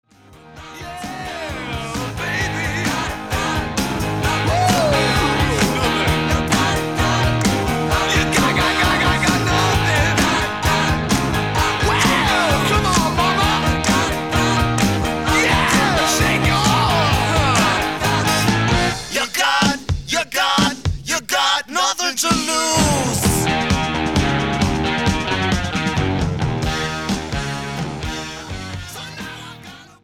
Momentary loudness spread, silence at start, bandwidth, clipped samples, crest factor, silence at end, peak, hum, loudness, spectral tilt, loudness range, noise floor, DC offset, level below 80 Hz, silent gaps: 10 LU; 0.3 s; 18.5 kHz; under 0.1%; 18 dB; 0.15 s; 0 dBFS; none; -17 LUFS; -4 dB/octave; 6 LU; -45 dBFS; 0.4%; -30 dBFS; none